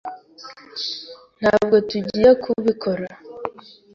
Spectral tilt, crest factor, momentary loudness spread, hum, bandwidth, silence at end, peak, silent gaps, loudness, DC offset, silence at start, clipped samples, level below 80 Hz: -6 dB/octave; 18 dB; 23 LU; none; 7.4 kHz; 0.45 s; -4 dBFS; none; -19 LUFS; under 0.1%; 0.05 s; under 0.1%; -54 dBFS